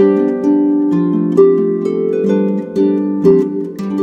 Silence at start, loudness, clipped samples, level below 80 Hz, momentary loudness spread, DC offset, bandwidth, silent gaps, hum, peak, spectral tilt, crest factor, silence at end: 0 s; -14 LUFS; under 0.1%; -56 dBFS; 6 LU; under 0.1%; 7.2 kHz; none; none; 0 dBFS; -9.5 dB/octave; 12 dB; 0 s